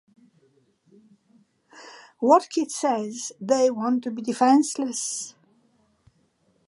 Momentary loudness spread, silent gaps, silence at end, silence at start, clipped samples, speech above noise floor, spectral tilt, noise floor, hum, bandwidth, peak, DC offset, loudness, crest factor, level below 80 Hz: 16 LU; none; 1.4 s; 1.75 s; under 0.1%; 44 dB; -3.5 dB/octave; -66 dBFS; none; 11.5 kHz; -4 dBFS; under 0.1%; -23 LUFS; 22 dB; -78 dBFS